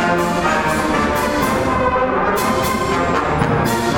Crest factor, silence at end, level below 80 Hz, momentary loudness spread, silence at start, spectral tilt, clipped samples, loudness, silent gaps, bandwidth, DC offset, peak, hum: 14 dB; 0 s; -34 dBFS; 1 LU; 0 s; -5 dB/octave; under 0.1%; -17 LUFS; none; 19 kHz; under 0.1%; -2 dBFS; none